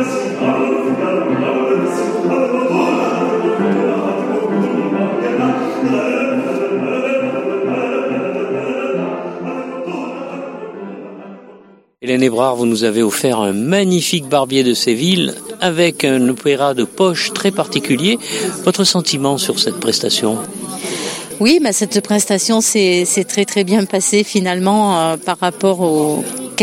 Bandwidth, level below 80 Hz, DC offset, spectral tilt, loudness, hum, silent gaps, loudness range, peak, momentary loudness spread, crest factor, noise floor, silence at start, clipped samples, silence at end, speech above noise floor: 16.5 kHz; -62 dBFS; under 0.1%; -4 dB/octave; -16 LUFS; none; none; 6 LU; 0 dBFS; 10 LU; 16 dB; -44 dBFS; 0 s; under 0.1%; 0 s; 30 dB